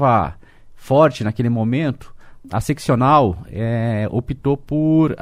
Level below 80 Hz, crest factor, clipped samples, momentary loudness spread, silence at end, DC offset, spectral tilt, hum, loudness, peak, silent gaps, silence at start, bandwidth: -42 dBFS; 16 dB; under 0.1%; 10 LU; 0 s; under 0.1%; -8 dB/octave; none; -18 LUFS; -2 dBFS; none; 0 s; 15 kHz